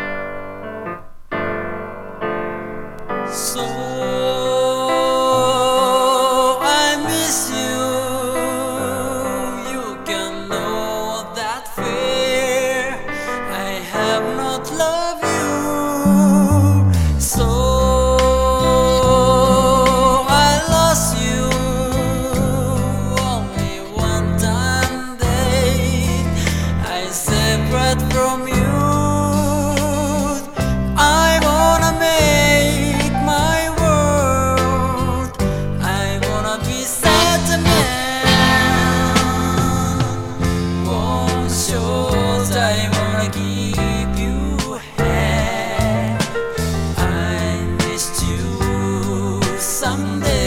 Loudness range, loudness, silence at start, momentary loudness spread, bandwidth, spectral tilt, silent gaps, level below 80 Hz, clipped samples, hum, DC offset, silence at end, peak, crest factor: 6 LU; -17 LUFS; 0 s; 10 LU; 18 kHz; -4.5 dB/octave; none; -28 dBFS; under 0.1%; none; under 0.1%; 0 s; 0 dBFS; 16 dB